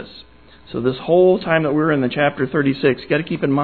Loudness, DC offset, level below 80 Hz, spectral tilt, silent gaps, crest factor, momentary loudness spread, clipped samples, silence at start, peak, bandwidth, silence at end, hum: -18 LUFS; 0.3%; -52 dBFS; -10.5 dB/octave; none; 16 dB; 8 LU; under 0.1%; 0 s; -2 dBFS; 4.6 kHz; 0 s; none